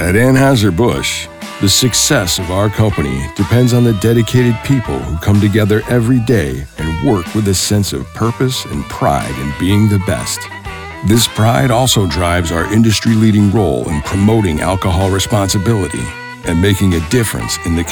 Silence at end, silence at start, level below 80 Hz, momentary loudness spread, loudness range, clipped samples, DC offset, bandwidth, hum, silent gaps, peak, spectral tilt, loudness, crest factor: 0 s; 0 s; -32 dBFS; 9 LU; 3 LU; under 0.1%; under 0.1%; over 20 kHz; none; none; 0 dBFS; -5 dB/octave; -13 LUFS; 12 dB